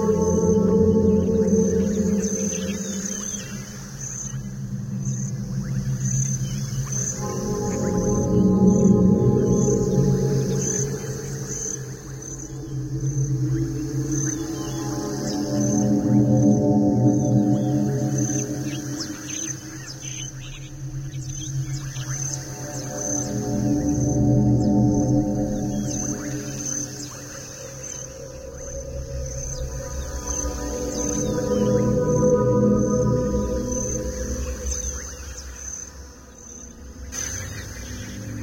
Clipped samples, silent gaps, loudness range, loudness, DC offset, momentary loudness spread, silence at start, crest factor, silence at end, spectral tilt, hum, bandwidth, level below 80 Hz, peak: under 0.1%; none; 11 LU; -23 LUFS; under 0.1%; 15 LU; 0 s; 18 dB; 0 s; -6 dB/octave; none; 16.5 kHz; -38 dBFS; -6 dBFS